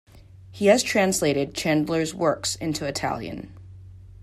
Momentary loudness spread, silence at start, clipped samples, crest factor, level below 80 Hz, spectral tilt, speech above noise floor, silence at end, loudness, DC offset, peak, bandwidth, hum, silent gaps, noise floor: 12 LU; 0.15 s; under 0.1%; 20 dB; -52 dBFS; -4 dB/octave; 23 dB; 0 s; -23 LUFS; under 0.1%; -4 dBFS; 15 kHz; none; none; -46 dBFS